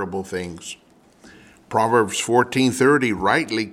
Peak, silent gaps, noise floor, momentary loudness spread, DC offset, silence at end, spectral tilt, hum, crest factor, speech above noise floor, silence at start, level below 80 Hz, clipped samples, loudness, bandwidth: -4 dBFS; none; -50 dBFS; 16 LU; under 0.1%; 0 s; -4.5 dB/octave; none; 18 dB; 30 dB; 0 s; -56 dBFS; under 0.1%; -19 LUFS; 16 kHz